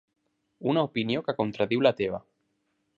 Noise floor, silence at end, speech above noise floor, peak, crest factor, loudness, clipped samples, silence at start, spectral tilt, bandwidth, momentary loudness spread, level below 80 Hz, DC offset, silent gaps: -75 dBFS; 0.8 s; 49 dB; -8 dBFS; 22 dB; -27 LUFS; under 0.1%; 0.6 s; -7.5 dB/octave; 7.4 kHz; 8 LU; -64 dBFS; under 0.1%; none